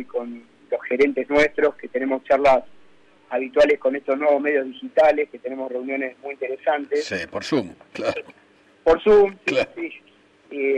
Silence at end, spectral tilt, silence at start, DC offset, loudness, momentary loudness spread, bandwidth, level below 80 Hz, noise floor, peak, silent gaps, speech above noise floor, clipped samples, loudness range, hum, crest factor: 0 s; -5 dB/octave; 0 s; under 0.1%; -21 LUFS; 13 LU; 9.6 kHz; -52 dBFS; -54 dBFS; -8 dBFS; none; 33 dB; under 0.1%; 5 LU; none; 14 dB